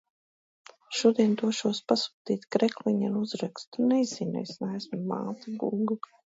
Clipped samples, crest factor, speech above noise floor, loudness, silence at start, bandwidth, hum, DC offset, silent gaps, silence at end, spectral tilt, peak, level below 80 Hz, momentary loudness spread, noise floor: under 0.1%; 20 dB; over 62 dB; -29 LUFS; 0.9 s; 8 kHz; none; under 0.1%; 2.14-2.25 s, 3.67-3.72 s; 0.35 s; -5.5 dB/octave; -8 dBFS; -76 dBFS; 9 LU; under -90 dBFS